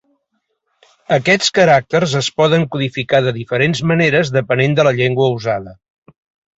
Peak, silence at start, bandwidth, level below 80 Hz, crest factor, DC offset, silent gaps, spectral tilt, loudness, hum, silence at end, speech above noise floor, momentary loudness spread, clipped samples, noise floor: 0 dBFS; 1.1 s; 8 kHz; -52 dBFS; 14 dB; under 0.1%; none; -5 dB/octave; -15 LUFS; none; 0.85 s; 55 dB; 7 LU; under 0.1%; -70 dBFS